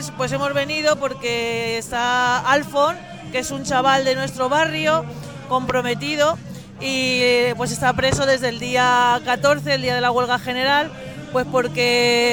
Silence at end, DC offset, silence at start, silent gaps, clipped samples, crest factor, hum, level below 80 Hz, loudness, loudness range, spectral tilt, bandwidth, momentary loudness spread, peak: 0 s; 0.2%; 0 s; none; under 0.1%; 18 dB; none; -50 dBFS; -19 LUFS; 2 LU; -3.5 dB/octave; 19.5 kHz; 8 LU; -2 dBFS